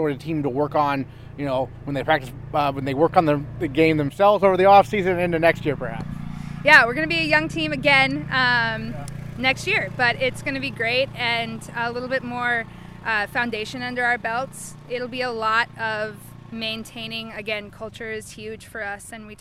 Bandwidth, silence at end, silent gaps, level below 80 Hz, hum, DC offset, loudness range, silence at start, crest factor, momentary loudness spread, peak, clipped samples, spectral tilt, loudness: 16 kHz; 0.05 s; none; -48 dBFS; none; under 0.1%; 8 LU; 0 s; 22 dB; 16 LU; 0 dBFS; under 0.1%; -5 dB/octave; -21 LUFS